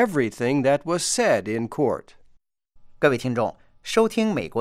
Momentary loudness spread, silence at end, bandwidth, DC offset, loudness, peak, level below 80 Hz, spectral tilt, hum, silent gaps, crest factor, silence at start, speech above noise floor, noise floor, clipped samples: 7 LU; 0 s; 16 kHz; under 0.1%; -23 LUFS; -6 dBFS; -56 dBFS; -4.5 dB/octave; none; none; 16 dB; 0 s; 36 dB; -58 dBFS; under 0.1%